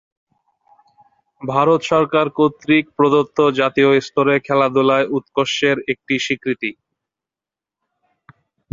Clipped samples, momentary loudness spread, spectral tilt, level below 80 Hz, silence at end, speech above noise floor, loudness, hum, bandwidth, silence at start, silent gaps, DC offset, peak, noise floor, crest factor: under 0.1%; 6 LU; -5.5 dB/octave; -60 dBFS; 2 s; 72 dB; -17 LUFS; none; 7.6 kHz; 1.4 s; none; under 0.1%; -2 dBFS; -89 dBFS; 18 dB